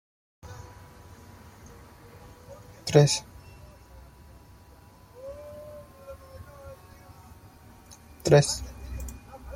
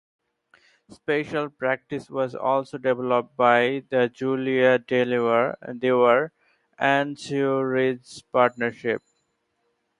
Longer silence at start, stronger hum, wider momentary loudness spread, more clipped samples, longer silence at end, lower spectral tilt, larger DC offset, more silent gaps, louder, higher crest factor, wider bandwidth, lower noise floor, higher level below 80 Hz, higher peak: second, 0.45 s vs 0.9 s; neither; first, 29 LU vs 9 LU; neither; second, 0 s vs 1 s; about the same, -5 dB/octave vs -6 dB/octave; neither; neither; about the same, -24 LUFS vs -23 LUFS; first, 28 dB vs 20 dB; first, 16.5 kHz vs 11 kHz; second, -52 dBFS vs -73 dBFS; first, -50 dBFS vs -70 dBFS; about the same, -4 dBFS vs -4 dBFS